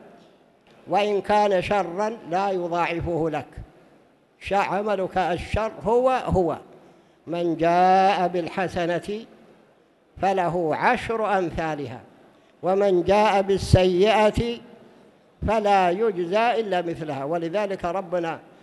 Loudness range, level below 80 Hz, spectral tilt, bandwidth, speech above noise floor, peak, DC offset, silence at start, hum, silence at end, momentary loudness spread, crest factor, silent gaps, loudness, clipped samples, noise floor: 5 LU; -44 dBFS; -6 dB/octave; 12 kHz; 36 dB; -2 dBFS; under 0.1%; 0.05 s; none; 0.25 s; 11 LU; 20 dB; none; -23 LUFS; under 0.1%; -59 dBFS